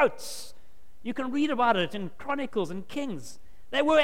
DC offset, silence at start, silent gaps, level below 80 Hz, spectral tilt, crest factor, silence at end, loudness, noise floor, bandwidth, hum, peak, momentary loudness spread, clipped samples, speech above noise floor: 1%; 0 s; none; -58 dBFS; -4.5 dB/octave; 18 dB; 0 s; -29 LUFS; -57 dBFS; 16.5 kHz; none; -10 dBFS; 16 LU; under 0.1%; 29 dB